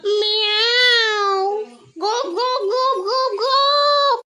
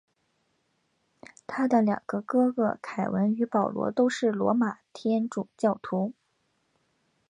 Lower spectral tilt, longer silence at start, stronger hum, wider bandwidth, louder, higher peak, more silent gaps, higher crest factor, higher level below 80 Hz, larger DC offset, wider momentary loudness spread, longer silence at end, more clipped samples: second, 0 dB/octave vs -7 dB/octave; second, 0.05 s vs 1.5 s; neither; first, 12.5 kHz vs 10 kHz; first, -16 LUFS vs -27 LUFS; first, -4 dBFS vs -10 dBFS; neither; about the same, 14 dB vs 18 dB; about the same, -76 dBFS vs -72 dBFS; neither; about the same, 10 LU vs 8 LU; second, 0.05 s vs 1.2 s; neither